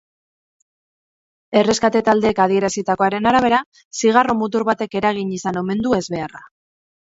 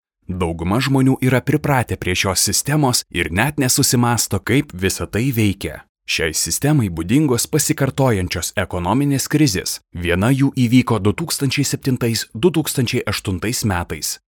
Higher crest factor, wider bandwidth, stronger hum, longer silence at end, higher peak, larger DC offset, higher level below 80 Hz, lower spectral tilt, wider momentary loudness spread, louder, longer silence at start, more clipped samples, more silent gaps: about the same, 18 dB vs 16 dB; second, 8 kHz vs 19.5 kHz; neither; first, 0.55 s vs 0.1 s; about the same, 0 dBFS vs -2 dBFS; neither; second, -52 dBFS vs -44 dBFS; about the same, -4.5 dB/octave vs -4.5 dB/octave; about the same, 8 LU vs 7 LU; about the same, -18 LUFS vs -18 LUFS; first, 1.5 s vs 0.3 s; neither; first, 3.66-3.72 s, 3.85-3.91 s vs 5.89-5.95 s